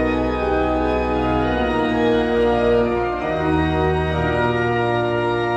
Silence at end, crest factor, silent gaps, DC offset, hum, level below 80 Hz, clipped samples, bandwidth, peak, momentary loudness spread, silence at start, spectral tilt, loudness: 0 s; 14 dB; none; under 0.1%; none; -32 dBFS; under 0.1%; 8.8 kHz; -6 dBFS; 3 LU; 0 s; -7.5 dB/octave; -19 LUFS